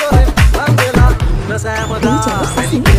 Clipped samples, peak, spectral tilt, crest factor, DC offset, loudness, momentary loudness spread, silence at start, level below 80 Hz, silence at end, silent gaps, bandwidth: under 0.1%; 0 dBFS; -5.5 dB/octave; 10 dB; under 0.1%; -13 LUFS; 7 LU; 0 s; -14 dBFS; 0 s; none; 16 kHz